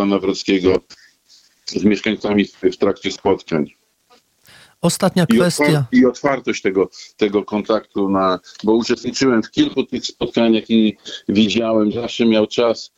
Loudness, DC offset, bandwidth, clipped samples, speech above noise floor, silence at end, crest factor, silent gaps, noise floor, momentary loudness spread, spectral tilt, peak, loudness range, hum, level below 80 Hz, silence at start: -17 LUFS; under 0.1%; 15.5 kHz; under 0.1%; 39 dB; 0.1 s; 14 dB; none; -56 dBFS; 7 LU; -5.5 dB/octave; -2 dBFS; 3 LU; none; -52 dBFS; 0 s